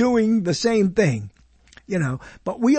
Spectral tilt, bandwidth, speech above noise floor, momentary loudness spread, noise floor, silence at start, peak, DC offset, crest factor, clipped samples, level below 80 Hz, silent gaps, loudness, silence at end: -6 dB/octave; 8.8 kHz; 32 dB; 12 LU; -52 dBFS; 0 s; -4 dBFS; under 0.1%; 16 dB; under 0.1%; -50 dBFS; none; -22 LUFS; 0 s